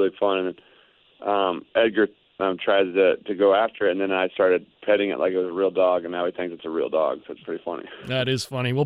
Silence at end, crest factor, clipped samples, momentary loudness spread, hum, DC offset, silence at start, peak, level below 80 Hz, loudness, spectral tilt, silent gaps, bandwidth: 0 s; 16 dB; under 0.1%; 11 LU; none; under 0.1%; 0 s; -6 dBFS; -66 dBFS; -23 LUFS; -6 dB/octave; none; 13.5 kHz